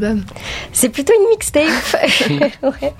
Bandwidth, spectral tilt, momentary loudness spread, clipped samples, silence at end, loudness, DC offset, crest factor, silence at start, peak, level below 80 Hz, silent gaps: 16.5 kHz; -3 dB/octave; 9 LU; under 0.1%; 0.05 s; -14 LUFS; under 0.1%; 14 dB; 0 s; 0 dBFS; -38 dBFS; none